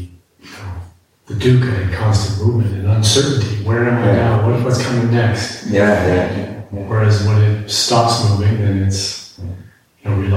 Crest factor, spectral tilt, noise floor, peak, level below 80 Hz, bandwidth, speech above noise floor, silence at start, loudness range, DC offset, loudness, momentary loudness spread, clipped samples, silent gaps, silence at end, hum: 14 dB; -5.5 dB/octave; -40 dBFS; 0 dBFS; -40 dBFS; 13 kHz; 26 dB; 0 s; 1 LU; under 0.1%; -15 LUFS; 17 LU; under 0.1%; none; 0 s; none